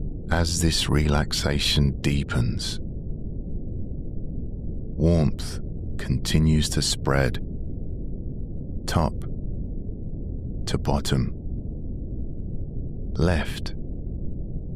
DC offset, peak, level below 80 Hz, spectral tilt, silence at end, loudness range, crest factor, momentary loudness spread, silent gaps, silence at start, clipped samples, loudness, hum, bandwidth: under 0.1%; -8 dBFS; -30 dBFS; -5 dB/octave; 0 s; 6 LU; 18 dB; 13 LU; none; 0 s; under 0.1%; -27 LUFS; none; 15 kHz